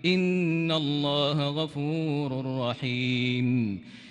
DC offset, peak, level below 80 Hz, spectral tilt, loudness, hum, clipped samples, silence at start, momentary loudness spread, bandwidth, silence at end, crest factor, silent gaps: under 0.1%; -14 dBFS; -68 dBFS; -7 dB/octave; -27 LUFS; none; under 0.1%; 0 s; 5 LU; 9.8 kHz; 0 s; 14 dB; none